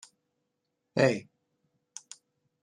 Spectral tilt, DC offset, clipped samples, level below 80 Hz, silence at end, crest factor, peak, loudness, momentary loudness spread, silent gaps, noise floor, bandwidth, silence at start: -5.5 dB/octave; under 0.1%; under 0.1%; -74 dBFS; 1.4 s; 26 dB; -8 dBFS; -28 LUFS; 24 LU; none; -82 dBFS; 11.5 kHz; 0.95 s